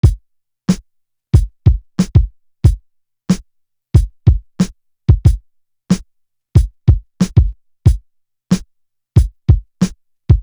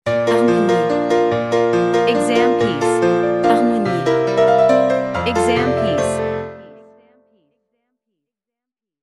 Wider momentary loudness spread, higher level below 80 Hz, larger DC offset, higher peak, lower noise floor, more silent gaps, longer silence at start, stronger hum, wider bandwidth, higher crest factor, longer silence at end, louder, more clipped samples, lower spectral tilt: first, 8 LU vs 5 LU; first, -20 dBFS vs -50 dBFS; neither; about the same, 0 dBFS vs -2 dBFS; second, -63 dBFS vs -86 dBFS; neither; about the same, 0.05 s vs 0.05 s; neither; first, over 20 kHz vs 12 kHz; about the same, 14 dB vs 16 dB; second, 0 s vs 2.3 s; about the same, -16 LUFS vs -16 LUFS; neither; first, -7.5 dB/octave vs -6 dB/octave